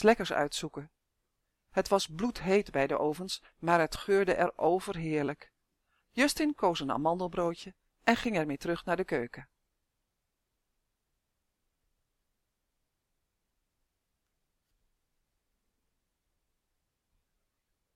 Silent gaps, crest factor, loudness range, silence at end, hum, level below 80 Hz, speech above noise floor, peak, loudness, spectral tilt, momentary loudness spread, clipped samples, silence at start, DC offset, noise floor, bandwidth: none; 24 dB; 7 LU; 8.5 s; none; -60 dBFS; 53 dB; -10 dBFS; -31 LUFS; -4.5 dB/octave; 10 LU; under 0.1%; 0 s; under 0.1%; -83 dBFS; 16 kHz